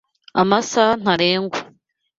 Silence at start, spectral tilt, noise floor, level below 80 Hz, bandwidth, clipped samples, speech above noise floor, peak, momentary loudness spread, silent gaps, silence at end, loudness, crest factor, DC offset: 0.35 s; -4 dB/octave; -56 dBFS; -58 dBFS; 7.8 kHz; under 0.1%; 39 dB; -2 dBFS; 9 LU; none; 0.55 s; -18 LUFS; 18 dB; under 0.1%